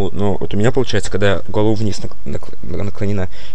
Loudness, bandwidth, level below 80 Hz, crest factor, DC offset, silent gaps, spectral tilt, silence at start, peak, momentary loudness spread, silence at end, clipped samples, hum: -20 LUFS; 10.5 kHz; -34 dBFS; 20 dB; 30%; none; -6 dB/octave; 0 s; -2 dBFS; 12 LU; 0 s; under 0.1%; none